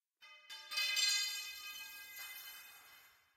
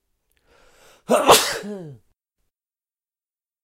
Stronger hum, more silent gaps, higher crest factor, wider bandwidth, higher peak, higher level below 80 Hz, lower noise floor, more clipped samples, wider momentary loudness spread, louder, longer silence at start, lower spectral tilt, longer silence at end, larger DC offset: neither; neither; about the same, 22 dB vs 24 dB; about the same, 16 kHz vs 16 kHz; second, -22 dBFS vs 0 dBFS; second, -88 dBFS vs -56 dBFS; second, -64 dBFS vs under -90 dBFS; neither; about the same, 22 LU vs 21 LU; second, -37 LUFS vs -17 LUFS; second, 0.2 s vs 1.1 s; second, 4.5 dB/octave vs -2 dB/octave; second, 0.25 s vs 1.7 s; neither